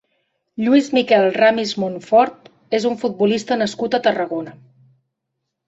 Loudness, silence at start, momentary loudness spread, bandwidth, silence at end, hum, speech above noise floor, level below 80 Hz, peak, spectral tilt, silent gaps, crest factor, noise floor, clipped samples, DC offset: -18 LUFS; 0.6 s; 9 LU; 8 kHz; 1.15 s; none; 60 dB; -64 dBFS; -2 dBFS; -5 dB/octave; none; 16 dB; -77 dBFS; under 0.1%; under 0.1%